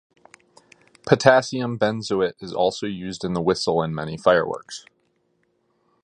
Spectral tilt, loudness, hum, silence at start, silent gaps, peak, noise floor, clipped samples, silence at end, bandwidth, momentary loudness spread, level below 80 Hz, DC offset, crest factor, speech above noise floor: -5 dB/octave; -22 LUFS; none; 1.05 s; none; 0 dBFS; -68 dBFS; under 0.1%; 1.25 s; 11 kHz; 13 LU; -56 dBFS; under 0.1%; 24 dB; 47 dB